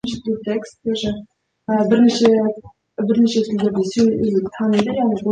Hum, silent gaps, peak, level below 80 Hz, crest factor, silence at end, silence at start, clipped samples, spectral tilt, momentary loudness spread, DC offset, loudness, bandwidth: none; none; -2 dBFS; -52 dBFS; 16 dB; 0 s; 0.05 s; under 0.1%; -6 dB/octave; 11 LU; under 0.1%; -18 LUFS; 9.2 kHz